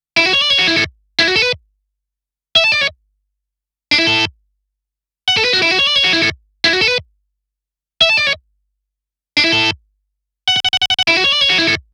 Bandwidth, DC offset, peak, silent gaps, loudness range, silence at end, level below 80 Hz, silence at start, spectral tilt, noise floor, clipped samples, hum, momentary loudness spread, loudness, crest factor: 16 kHz; under 0.1%; -2 dBFS; none; 3 LU; 0.15 s; -50 dBFS; 0.15 s; -2 dB/octave; -85 dBFS; under 0.1%; none; 8 LU; -13 LUFS; 16 dB